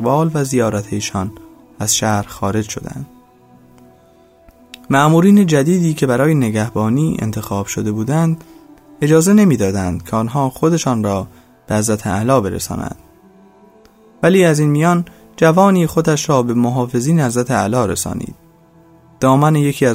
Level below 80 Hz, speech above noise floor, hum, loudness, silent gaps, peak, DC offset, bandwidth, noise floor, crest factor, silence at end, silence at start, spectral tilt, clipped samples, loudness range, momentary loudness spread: -46 dBFS; 34 dB; none; -15 LUFS; none; 0 dBFS; under 0.1%; 16 kHz; -48 dBFS; 16 dB; 0 s; 0 s; -6 dB/octave; under 0.1%; 6 LU; 12 LU